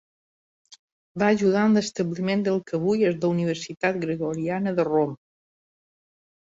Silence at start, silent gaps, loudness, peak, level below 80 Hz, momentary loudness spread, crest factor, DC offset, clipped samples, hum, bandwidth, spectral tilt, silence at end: 1.15 s; none; -24 LUFS; -8 dBFS; -64 dBFS; 8 LU; 18 dB; under 0.1%; under 0.1%; none; 7.8 kHz; -6.5 dB/octave; 1.3 s